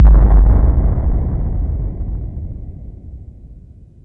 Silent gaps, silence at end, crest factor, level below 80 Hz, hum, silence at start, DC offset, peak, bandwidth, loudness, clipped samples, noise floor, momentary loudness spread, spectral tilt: none; 0.45 s; 12 dB; -14 dBFS; none; 0 s; under 0.1%; 0 dBFS; 2.1 kHz; -16 LUFS; under 0.1%; -39 dBFS; 23 LU; -12.5 dB/octave